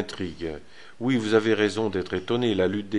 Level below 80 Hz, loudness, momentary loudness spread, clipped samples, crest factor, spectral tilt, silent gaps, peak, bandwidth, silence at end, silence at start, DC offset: -52 dBFS; -25 LUFS; 12 LU; under 0.1%; 18 dB; -6 dB/octave; none; -8 dBFS; 11.5 kHz; 0 s; 0 s; 0.6%